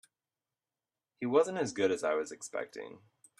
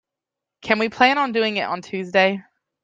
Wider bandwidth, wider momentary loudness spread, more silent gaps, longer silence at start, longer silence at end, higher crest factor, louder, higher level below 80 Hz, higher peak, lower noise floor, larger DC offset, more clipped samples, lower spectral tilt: first, 12 kHz vs 9 kHz; first, 15 LU vs 11 LU; neither; first, 1.2 s vs 0.65 s; about the same, 0.45 s vs 0.45 s; about the same, 22 dB vs 20 dB; second, -33 LUFS vs -20 LUFS; second, -80 dBFS vs -64 dBFS; second, -14 dBFS vs -2 dBFS; first, under -90 dBFS vs -86 dBFS; neither; neither; about the same, -4.5 dB/octave vs -5 dB/octave